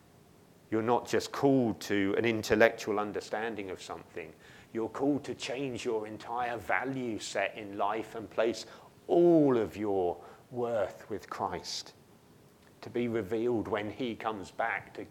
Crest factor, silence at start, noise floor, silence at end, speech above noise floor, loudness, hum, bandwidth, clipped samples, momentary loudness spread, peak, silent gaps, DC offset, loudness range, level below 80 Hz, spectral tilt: 26 dB; 0.7 s; -59 dBFS; 0 s; 28 dB; -32 LUFS; none; 16 kHz; under 0.1%; 15 LU; -8 dBFS; none; under 0.1%; 6 LU; -66 dBFS; -5.5 dB/octave